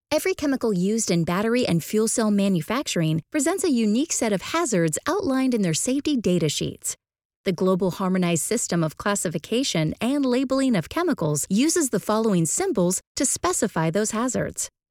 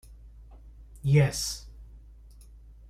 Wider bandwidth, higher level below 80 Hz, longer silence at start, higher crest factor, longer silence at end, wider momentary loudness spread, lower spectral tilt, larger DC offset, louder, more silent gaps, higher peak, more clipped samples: first, 17 kHz vs 15 kHz; second, -56 dBFS vs -48 dBFS; about the same, 0.1 s vs 0.1 s; second, 14 dB vs 20 dB; second, 0.25 s vs 0.9 s; second, 4 LU vs 18 LU; about the same, -4.5 dB/octave vs -5.5 dB/octave; neither; first, -23 LUFS vs -27 LUFS; first, 7.25-7.30 s, 7.36-7.44 s, 13.07-13.15 s vs none; about the same, -8 dBFS vs -10 dBFS; neither